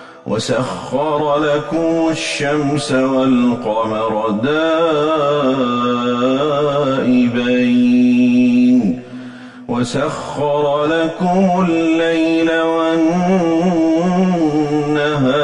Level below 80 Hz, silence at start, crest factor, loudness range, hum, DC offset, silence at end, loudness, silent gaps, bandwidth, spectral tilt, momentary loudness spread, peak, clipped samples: -50 dBFS; 0 s; 10 dB; 3 LU; none; under 0.1%; 0 s; -15 LUFS; none; 11 kHz; -6 dB/octave; 7 LU; -4 dBFS; under 0.1%